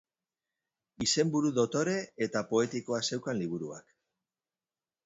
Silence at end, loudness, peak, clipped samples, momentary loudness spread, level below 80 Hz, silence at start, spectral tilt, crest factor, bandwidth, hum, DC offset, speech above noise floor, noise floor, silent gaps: 1.25 s; -31 LUFS; -14 dBFS; under 0.1%; 9 LU; -70 dBFS; 1 s; -4 dB/octave; 18 dB; 8.2 kHz; none; under 0.1%; over 59 dB; under -90 dBFS; none